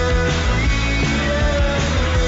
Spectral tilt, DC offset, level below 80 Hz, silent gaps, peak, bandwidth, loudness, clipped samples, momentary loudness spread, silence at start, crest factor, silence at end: -5 dB/octave; under 0.1%; -20 dBFS; none; -6 dBFS; 8 kHz; -18 LUFS; under 0.1%; 0 LU; 0 s; 10 dB; 0 s